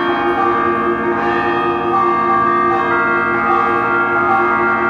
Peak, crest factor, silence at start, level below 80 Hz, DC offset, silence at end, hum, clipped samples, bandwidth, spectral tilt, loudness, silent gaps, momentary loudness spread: -4 dBFS; 12 dB; 0 s; -46 dBFS; under 0.1%; 0 s; none; under 0.1%; 6.8 kHz; -7 dB/octave; -14 LUFS; none; 3 LU